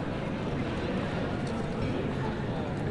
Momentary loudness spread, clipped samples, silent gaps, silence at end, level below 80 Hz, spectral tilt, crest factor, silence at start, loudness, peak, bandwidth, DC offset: 1 LU; under 0.1%; none; 0 s; -46 dBFS; -7.5 dB/octave; 14 dB; 0 s; -32 LUFS; -18 dBFS; 11 kHz; under 0.1%